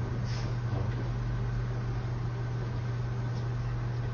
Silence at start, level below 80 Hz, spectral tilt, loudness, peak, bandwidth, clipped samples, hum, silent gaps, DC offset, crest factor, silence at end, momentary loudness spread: 0 s; -40 dBFS; -7.5 dB/octave; -34 LUFS; -22 dBFS; 7 kHz; under 0.1%; none; none; under 0.1%; 10 dB; 0 s; 2 LU